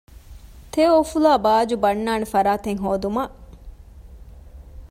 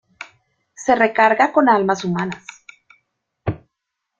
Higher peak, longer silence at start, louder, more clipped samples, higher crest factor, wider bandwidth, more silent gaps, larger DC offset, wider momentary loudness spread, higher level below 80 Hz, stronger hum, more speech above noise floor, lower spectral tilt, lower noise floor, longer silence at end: second, -6 dBFS vs -2 dBFS; about the same, 0.3 s vs 0.2 s; second, -20 LUFS vs -17 LUFS; neither; about the same, 16 dB vs 18 dB; first, 16 kHz vs 8 kHz; neither; neither; second, 9 LU vs 24 LU; first, -42 dBFS vs -54 dBFS; neither; second, 23 dB vs 63 dB; about the same, -5.5 dB/octave vs -5.5 dB/octave; second, -42 dBFS vs -79 dBFS; second, 0.05 s vs 0.65 s